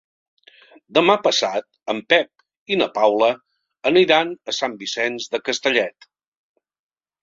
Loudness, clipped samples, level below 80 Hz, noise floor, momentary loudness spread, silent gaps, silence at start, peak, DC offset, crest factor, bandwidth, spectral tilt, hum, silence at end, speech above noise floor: -19 LUFS; under 0.1%; -66 dBFS; -50 dBFS; 12 LU; 2.57-2.66 s; 0.9 s; 0 dBFS; under 0.1%; 20 dB; 7.6 kHz; -3 dB/octave; none; 1.3 s; 31 dB